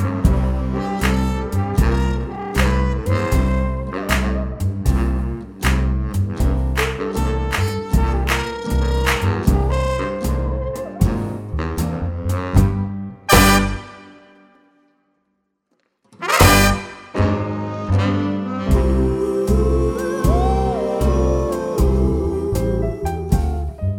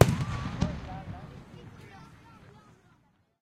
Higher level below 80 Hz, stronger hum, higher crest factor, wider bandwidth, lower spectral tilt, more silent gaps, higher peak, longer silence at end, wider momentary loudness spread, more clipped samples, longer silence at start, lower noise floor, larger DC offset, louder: first, -22 dBFS vs -46 dBFS; neither; second, 18 dB vs 30 dB; first, 19 kHz vs 15.5 kHz; about the same, -5.5 dB/octave vs -6.5 dB/octave; neither; about the same, 0 dBFS vs -2 dBFS; second, 0 s vs 1.25 s; second, 7 LU vs 21 LU; neither; about the same, 0 s vs 0 s; first, -70 dBFS vs -66 dBFS; neither; first, -19 LUFS vs -32 LUFS